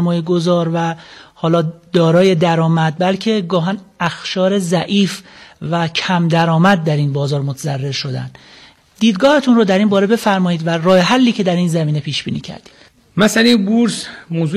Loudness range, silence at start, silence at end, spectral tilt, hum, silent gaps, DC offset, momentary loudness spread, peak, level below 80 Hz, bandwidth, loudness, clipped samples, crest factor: 3 LU; 0 s; 0 s; -6 dB/octave; none; none; under 0.1%; 10 LU; -2 dBFS; -56 dBFS; 13.5 kHz; -15 LUFS; under 0.1%; 12 dB